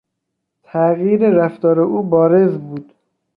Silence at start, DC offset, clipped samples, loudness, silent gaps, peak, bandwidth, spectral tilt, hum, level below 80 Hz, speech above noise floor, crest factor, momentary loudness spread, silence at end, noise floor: 0.75 s; under 0.1%; under 0.1%; -15 LUFS; none; -2 dBFS; 4.4 kHz; -12 dB/octave; none; -62 dBFS; 62 dB; 14 dB; 13 LU; 0.55 s; -76 dBFS